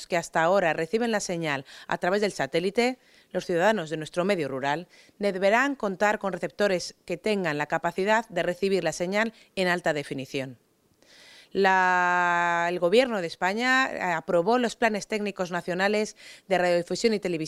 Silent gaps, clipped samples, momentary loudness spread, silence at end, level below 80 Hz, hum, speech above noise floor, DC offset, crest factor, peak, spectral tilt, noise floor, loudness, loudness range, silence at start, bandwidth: none; under 0.1%; 9 LU; 0 s; -64 dBFS; none; 36 dB; under 0.1%; 18 dB; -8 dBFS; -4.5 dB/octave; -61 dBFS; -26 LUFS; 4 LU; 0 s; 15 kHz